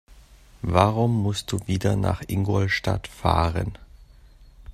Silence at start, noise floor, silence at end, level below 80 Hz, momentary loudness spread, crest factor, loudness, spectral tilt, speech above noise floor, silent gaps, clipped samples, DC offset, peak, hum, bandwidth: 0.65 s; -50 dBFS; 0 s; -42 dBFS; 8 LU; 24 dB; -24 LUFS; -6.5 dB/octave; 27 dB; none; under 0.1%; under 0.1%; 0 dBFS; none; 14.5 kHz